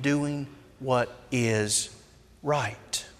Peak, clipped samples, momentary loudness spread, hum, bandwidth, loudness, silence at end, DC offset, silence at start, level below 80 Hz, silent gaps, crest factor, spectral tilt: -10 dBFS; under 0.1%; 12 LU; none; 15.5 kHz; -28 LUFS; 0.1 s; under 0.1%; 0 s; -60 dBFS; none; 18 dB; -4 dB/octave